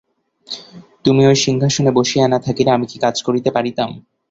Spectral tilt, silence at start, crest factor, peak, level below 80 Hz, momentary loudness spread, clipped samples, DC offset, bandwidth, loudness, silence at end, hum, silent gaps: -5 dB/octave; 0.5 s; 16 dB; -2 dBFS; -52 dBFS; 15 LU; under 0.1%; under 0.1%; 8 kHz; -16 LUFS; 0.3 s; none; none